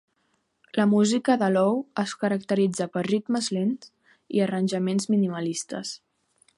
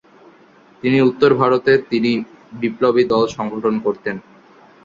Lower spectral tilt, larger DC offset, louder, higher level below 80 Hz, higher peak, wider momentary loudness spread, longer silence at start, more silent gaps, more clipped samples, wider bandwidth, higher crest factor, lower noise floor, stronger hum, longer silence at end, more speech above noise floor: second, -5.5 dB/octave vs -7 dB/octave; neither; second, -25 LUFS vs -17 LUFS; second, -72 dBFS vs -58 dBFS; second, -8 dBFS vs -2 dBFS; about the same, 10 LU vs 11 LU; about the same, 0.75 s vs 0.85 s; neither; neither; first, 11.5 kHz vs 7.4 kHz; about the same, 18 dB vs 16 dB; first, -72 dBFS vs -48 dBFS; neither; about the same, 0.6 s vs 0.65 s; first, 48 dB vs 32 dB